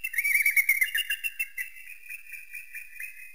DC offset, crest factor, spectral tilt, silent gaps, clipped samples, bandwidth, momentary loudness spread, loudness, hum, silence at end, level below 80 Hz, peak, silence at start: 0.4%; 20 dB; 5 dB/octave; none; under 0.1%; 16 kHz; 19 LU; -24 LUFS; none; 0 s; -68 dBFS; -10 dBFS; 0.05 s